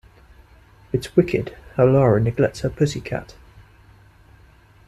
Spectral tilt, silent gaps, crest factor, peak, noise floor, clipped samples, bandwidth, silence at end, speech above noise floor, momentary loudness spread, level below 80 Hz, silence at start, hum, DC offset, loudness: -7.5 dB/octave; none; 18 dB; -4 dBFS; -51 dBFS; under 0.1%; 13 kHz; 1.65 s; 32 dB; 13 LU; -44 dBFS; 0.95 s; none; under 0.1%; -20 LUFS